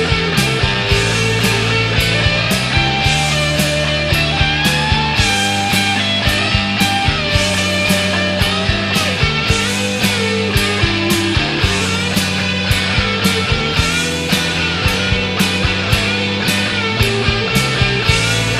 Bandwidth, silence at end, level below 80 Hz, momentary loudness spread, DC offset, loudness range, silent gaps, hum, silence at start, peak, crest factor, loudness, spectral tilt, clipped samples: 15.5 kHz; 0 s; -28 dBFS; 2 LU; under 0.1%; 1 LU; none; none; 0 s; 0 dBFS; 14 dB; -14 LUFS; -4 dB/octave; under 0.1%